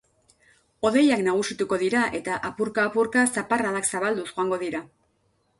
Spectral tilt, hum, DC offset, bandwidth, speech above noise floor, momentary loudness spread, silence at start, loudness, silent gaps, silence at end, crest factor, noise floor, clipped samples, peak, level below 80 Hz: -3.5 dB/octave; none; under 0.1%; 11.5 kHz; 45 dB; 8 LU; 0.8 s; -24 LUFS; none; 0.75 s; 16 dB; -68 dBFS; under 0.1%; -8 dBFS; -62 dBFS